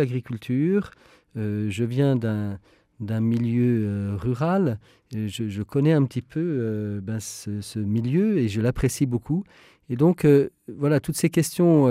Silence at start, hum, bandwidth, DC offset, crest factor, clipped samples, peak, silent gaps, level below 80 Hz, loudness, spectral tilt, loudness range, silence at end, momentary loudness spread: 0 s; none; 16 kHz; under 0.1%; 16 dB; under 0.1%; -6 dBFS; none; -50 dBFS; -24 LUFS; -7 dB/octave; 3 LU; 0 s; 12 LU